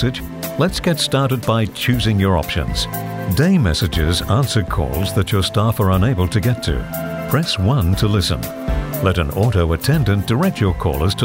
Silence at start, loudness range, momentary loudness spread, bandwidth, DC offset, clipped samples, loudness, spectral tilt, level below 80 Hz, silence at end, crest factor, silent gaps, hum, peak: 0 s; 1 LU; 6 LU; 16.5 kHz; under 0.1%; under 0.1%; -18 LUFS; -5.5 dB/octave; -28 dBFS; 0 s; 14 dB; none; none; -2 dBFS